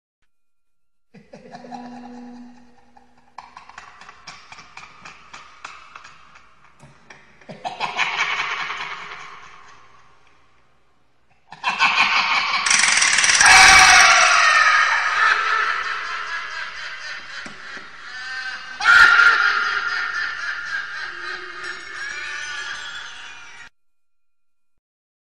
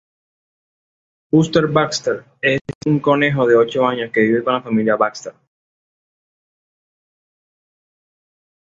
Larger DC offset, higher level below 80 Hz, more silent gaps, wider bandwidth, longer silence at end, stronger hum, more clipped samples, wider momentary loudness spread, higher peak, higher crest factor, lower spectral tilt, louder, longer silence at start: first, 0.4% vs under 0.1%; first, -50 dBFS vs -56 dBFS; second, none vs 2.61-2.65 s, 2.75-2.81 s; first, 15 kHz vs 8 kHz; second, 1.7 s vs 3.3 s; neither; neither; first, 25 LU vs 7 LU; about the same, 0 dBFS vs -2 dBFS; about the same, 20 dB vs 18 dB; second, 1 dB/octave vs -6 dB/octave; about the same, -15 LUFS vs -17 LUFS; second, 1.15 s vs 1.35 s